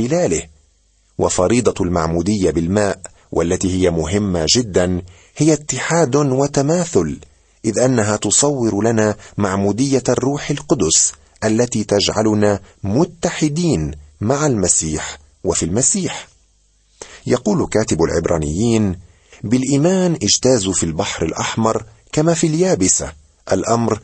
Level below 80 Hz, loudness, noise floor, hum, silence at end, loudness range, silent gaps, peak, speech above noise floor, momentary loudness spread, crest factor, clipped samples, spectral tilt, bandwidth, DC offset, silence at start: -40 dBFS; -17 LUFS; -57 dBFS; none; 0.05 s; 2 LU; none; 0 dBFS; 40 dB; 9 LU; 18 dB; under 0.1%; -4.5 dB/octave; 9 kHz; under 0.1%; 0 s